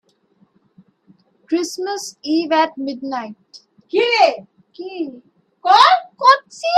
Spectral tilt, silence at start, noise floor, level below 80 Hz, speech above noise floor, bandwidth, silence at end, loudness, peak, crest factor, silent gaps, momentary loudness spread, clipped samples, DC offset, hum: -2 dB/octave; 1.5 s; -59 dBFS; -72 dBFS; 42 dB; 13.5 kHz; 0 s; -17 LUFS; 0 dBFS; 18 dB; none; 17 LU; under 0.1%; under 0.1%; none